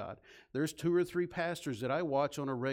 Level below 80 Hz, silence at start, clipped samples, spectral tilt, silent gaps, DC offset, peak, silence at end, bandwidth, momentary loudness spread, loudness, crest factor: -68 dBFS; 0 s; under 0.1%; -6 dB/octave; none; under 0.1%; -20 dBFS; 0 s; 16.5 kHz; 9 LU; -35 LUFS; 14 dB